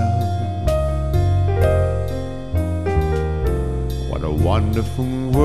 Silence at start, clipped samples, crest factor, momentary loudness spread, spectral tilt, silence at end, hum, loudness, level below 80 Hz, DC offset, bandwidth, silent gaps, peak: 0 s; under 0.1%; 16 dB; 7 LU; -8 dB/octave; 0 s; none; -21 LUFS; -26 dBFS; 2%; 14 kHz; none; -2 dBFS